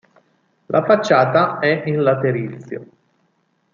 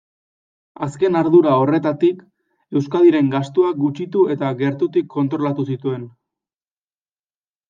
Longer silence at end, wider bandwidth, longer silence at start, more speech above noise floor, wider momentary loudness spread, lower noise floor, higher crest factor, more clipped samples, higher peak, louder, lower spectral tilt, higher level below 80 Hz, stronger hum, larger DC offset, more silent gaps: second, 0.9 s vs 1.6 s; about the same, 7.4 kHz vs 7.6 kHz; about the same, 0.7 s vs 0.8 s; second, 48 dB vs over 73 dB; first, 17 LU vs 11 LU; second, -65 dBFS vs under -90 dBFS; about the same, 18 dB vs 16 dB; neither; about the same, -2 dBFS vs -2 dBFS; about the same, -17 LUFS vs -18 LUFS; second, -6.5 dB/octave vs -8.5 dB/octave; about the same, -66 dBFS vs -66 dBFS; neither; neither; neither